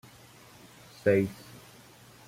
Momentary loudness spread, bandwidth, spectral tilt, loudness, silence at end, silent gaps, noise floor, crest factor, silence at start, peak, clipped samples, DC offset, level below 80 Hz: 26 LU; 16.5 kHz; -7 dB/octave; -28 LUFS; 0.95 s; none; -54 dBFS; 22 dB; 1.05 s; -12 dBFS; under 0.1%; under 0.1%; -66 dBFS